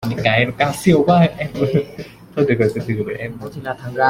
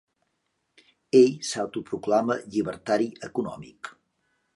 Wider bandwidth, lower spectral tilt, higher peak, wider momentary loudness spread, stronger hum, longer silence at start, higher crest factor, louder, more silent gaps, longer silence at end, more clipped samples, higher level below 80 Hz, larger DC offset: first, 16 kHz vs 11.5 kHz; first, -6.5 dB/octave vs -5 dB/octave; first, -2 dBFS vs -6 dBFS; second, 14 LU vs 21 LU; neither; second, 0 s vs 1.15 s; about the same, 16 dB vs 20 dB; first, -18 LUFS vs -25 LUFS; neither; second, 0 s vs 0.65 s; neither; first, -48 dBFS vs -66 dBFS; neither